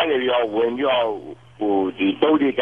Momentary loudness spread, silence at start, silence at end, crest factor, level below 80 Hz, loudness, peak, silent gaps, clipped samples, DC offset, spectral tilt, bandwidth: 9 LU; 0 s; 0 s; 16 dB; -62 dBFS; -20 LUFS; -4 dBFS; none; under 0.1%; 0.2%; -7 dB/octave; 4.2 kHz